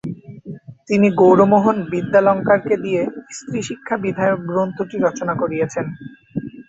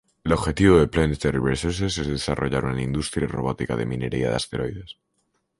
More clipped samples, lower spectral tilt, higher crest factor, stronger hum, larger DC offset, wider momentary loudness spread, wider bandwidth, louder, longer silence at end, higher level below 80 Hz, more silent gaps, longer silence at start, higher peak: neither; about the same, -7 dB/octave vs -6 dB/octave; about the same, 16 dB vs 20 dB; neither; neither; first, 20 LU vs 10 LU; second, 8 kHz vs 11.5 kHz; first, -18 LUFS vs -23 LUFS; second, 0.05 s vs 0.65 s; second, -56 dBFS vs -38 dBFS; neither; second, 0.05 s vs 0.25 s; about the same, -2 dBFS vs -4 dBFS